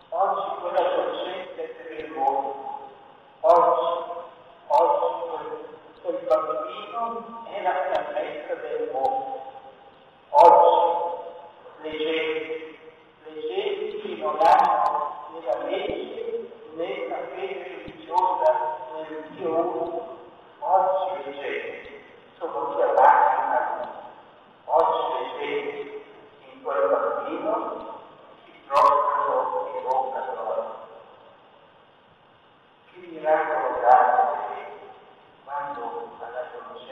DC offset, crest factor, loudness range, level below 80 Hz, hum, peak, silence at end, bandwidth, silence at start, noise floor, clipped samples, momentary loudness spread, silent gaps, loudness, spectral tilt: under 0.1%; 22 dB; 8 LU; -68 dBFS; none; -2 dBFS; 0 s; 9.2 kHz; 0.1 s; -56 dBFS; under 0.1%; 19 LU; none; -24 LUFS; -5 dB/octave